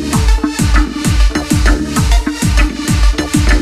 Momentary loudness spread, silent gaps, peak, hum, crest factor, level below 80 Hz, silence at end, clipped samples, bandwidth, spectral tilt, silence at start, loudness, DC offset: 1 LU; none; 0 dBFS; none; 12 dB; -12 dBFS; 0 s; under 0.1%; 14.5 kHz; -5 dB/octave; 0 s; -14 LUFS; under 0.1%